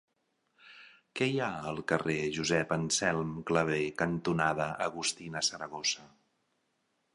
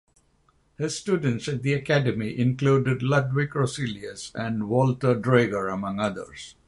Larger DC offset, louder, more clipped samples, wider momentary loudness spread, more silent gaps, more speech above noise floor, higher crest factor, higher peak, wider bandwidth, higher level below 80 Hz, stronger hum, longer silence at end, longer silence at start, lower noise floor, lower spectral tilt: neither; second, -32 LUFS vs -25 LUFS; neither; second, 5 LU vs 10 LU; neither; first, 46 dB vs 40 dB; about the same, 24 dB vs 20 dB; second, -10 dBFS vs -6 dBFS; about the same, 11.5 kHz vs 11.5 kHz; second, -62 dBFS vs -56 dBFS; neither; first, 1.05 s vs 0.15 s; second, 0.65 s vs 0.8 s; first, -78 dBFS vs -64 dBFS; second, -3.5 dB/octave vs -6.5 dB/octave